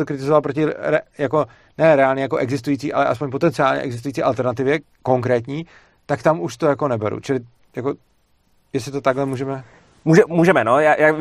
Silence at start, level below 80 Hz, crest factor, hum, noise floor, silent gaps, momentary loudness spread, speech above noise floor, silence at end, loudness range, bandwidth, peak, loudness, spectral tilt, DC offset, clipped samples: 0 s; -58 dBFS; 18 dB; none; -60 dBFS; none; 13 LU; 42 dB; 0 s; 5 LU; 13.5 kHz; 0 dBFS; -19 LUFS; -7 dB/octave; under 0.1%; under 0.1%